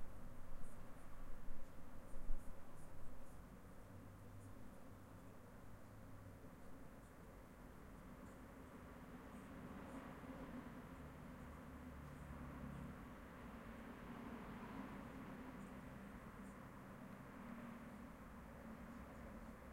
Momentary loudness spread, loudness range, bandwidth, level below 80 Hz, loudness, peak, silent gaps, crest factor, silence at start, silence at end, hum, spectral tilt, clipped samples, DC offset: 7 LU; 6 LU; 16 kHz; -58 dBFS; -57 LUFS; -28 dBFS; none; 22 dB; 0 s; 0 s; none; -6.5 dB/octave; under 0.1%; under 0.1%